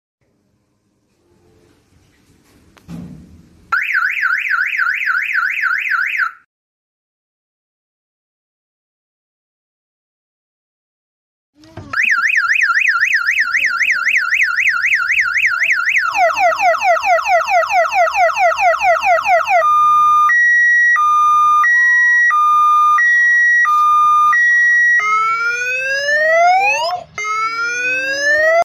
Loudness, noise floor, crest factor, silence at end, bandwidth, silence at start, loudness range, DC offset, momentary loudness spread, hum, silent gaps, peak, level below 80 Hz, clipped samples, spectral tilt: -12 LUFS; -62 dBFS; 12 dB; 0 s; 14.5 kHz; 2.9 s; 10 LU; under 0.1%; 7 LU; none; 6.46-11.53 s; -4 dBFS; -58 dBFS; under 0.1%; -1 dB/octave